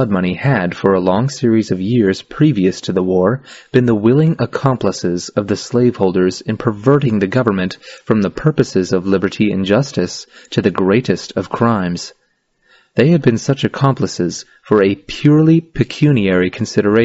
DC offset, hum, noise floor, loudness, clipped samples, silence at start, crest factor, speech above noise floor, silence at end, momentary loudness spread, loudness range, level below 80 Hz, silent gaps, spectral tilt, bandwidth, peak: under 0.1%; none; -61 dBFS; -15 LUFS; under 0.1%; 0 s; 14 dB; 46 dB; 0 s; 8 LU; 2 LU; -46 dBFS; none; -6.5 dB/octave; 8 kHz; 0 dBFS